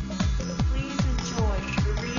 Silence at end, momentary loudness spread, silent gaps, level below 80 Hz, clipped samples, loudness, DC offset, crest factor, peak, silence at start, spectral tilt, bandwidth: 0 s; 1 LU; none; -30 dBFS; under 0.1%; -27 LUFS; under 0.1%; 12 dB; -12 dBFS; 0 s; -5.5 dB/octave; 7.4 kHz